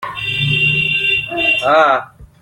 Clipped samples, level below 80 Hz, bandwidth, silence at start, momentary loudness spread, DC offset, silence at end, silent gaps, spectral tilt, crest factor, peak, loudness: under 0.1%; -46 dBFS; 16.5 kHz; 0 s; 6 LU; under 0.1%; 0.15 s; none; -5 dB/octave; 14 dB; -2 dBFS; -13 LUFS